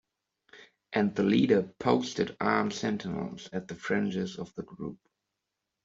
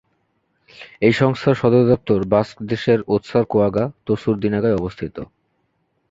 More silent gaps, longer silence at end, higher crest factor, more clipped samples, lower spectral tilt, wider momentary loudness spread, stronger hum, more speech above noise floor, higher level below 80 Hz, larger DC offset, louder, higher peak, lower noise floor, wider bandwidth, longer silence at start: neither; about the same, 0.9 s vs 0.85 s; about the same, 22 dB vs 18 dB; neither; second, -6 dB/octave vs -8 dB/octave; first, 15 LU vs 11 LU; neither; first, 56 dB vs 50 dB; second, -66 dBFS vs -48 dBFS; neither; second, -30 LUFS vs -18 LUFS; second, -10 dBFS vs 0 dBFS; first, -85 dBFS vs -68 dBFS; about the same, 7.8 kHz vs 7.8 kHz; second, 0.55 s vs 0.8 s